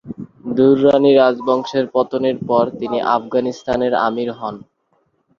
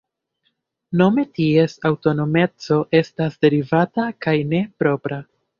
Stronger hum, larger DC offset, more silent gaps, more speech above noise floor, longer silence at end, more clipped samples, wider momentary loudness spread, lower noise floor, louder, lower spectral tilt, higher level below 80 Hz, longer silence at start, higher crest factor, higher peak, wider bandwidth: neither; neither; neither; second, 48 dB vs 52 dB; first, 0.8 s vs 0.35 s; neither; first, 14 LU vs 7 LU; second, -64 dBFS vs -70 dBFS; first, -16 LUFS vs -19 LUFS; about the same, -7 dB/octave vs -8 dB/octave; about the same, -54 dBFS vs -58 dBFS; second, 0.05 s vs 0.9 s; about the same, 16 dB vs 18 dB; about the same, 0 dBFS vs -2 dBFS; about the same, 7.2 kHz vs 7.2 kHz